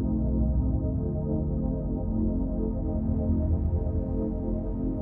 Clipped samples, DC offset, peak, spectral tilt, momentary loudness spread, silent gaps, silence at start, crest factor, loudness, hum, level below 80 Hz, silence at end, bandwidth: under 0.1%; under 0.1%; -14 dBFS; -15 dB/octave; 4 LU; none; 0 s; 14 dB; -29 LUFS; none; -30 dBFS; 0 s; 1.9 kHz